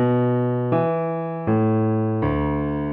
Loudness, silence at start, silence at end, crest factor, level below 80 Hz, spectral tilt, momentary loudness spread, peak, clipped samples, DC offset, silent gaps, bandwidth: -22 LUFS; 0 s; 0 s; 12 dB; -40 dBFS; -12.5 dB/octave; 5 LU; -8 dBFS; under 0.1%; under 0.1%; none; 4 kHz